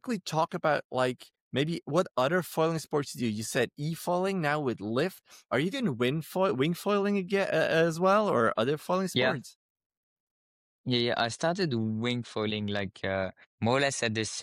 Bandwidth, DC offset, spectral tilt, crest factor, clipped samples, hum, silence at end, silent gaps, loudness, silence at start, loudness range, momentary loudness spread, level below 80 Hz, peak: 16.5 kHz; under 0.1%; -5 dB/octave; 16 dB; under 0.1%; none; 0 s; 0.84-0.90 s, 1.41-1.51 s, 9.55-9.75 s, 9.86-9.90 s, 9.97-10.84 s, 13.47-13.58 s; -29 LUFS; 0.05 s; 4 LU; 7 LU; -70 dBFS; -14 dBFS